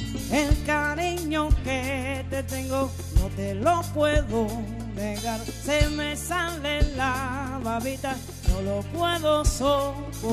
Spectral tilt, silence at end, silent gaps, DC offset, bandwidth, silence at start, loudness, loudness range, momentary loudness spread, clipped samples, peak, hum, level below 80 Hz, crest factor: -5 dB/octave; 0 s; none; under 0.1%; 14 kHz; 0 s; -26 LUFS; 1 LU; 7 LU; under 0.1%; -8 dBFS; none; -32 dBFS; 18 dB